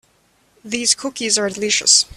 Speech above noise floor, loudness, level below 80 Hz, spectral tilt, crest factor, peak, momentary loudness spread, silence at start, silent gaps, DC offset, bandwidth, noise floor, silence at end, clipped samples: 41 dB; -16 LUFS; -58 dBFS; 0 dB/octave; 20 dB; 0 dBFS; 8 LU; 0.65 s; none; under 0.1%; 15 kHz; -59 dBFS; 0.1 s; under 0.1%